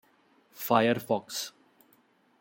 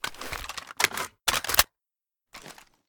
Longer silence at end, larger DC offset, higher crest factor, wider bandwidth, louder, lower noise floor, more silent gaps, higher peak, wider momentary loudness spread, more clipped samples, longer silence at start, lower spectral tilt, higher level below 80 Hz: first, 0.9 s vs 0.35 s; neither; second, 24 dB vs 30 dB; second, 17 kHz vs over 20 kHz; second, -29 LUFS vs -26 LUFS; second, -66 dBFS vs -89 dBFS; neither; second, -8 dBFS vs -2 dBFS; second, 14 LU vs 23 LU; neither; first, 0.55 s vs 0.05 s; first, -4.5 dB/octave vs 0 dB/octave; second, -78 dBFS vs -50 dBFS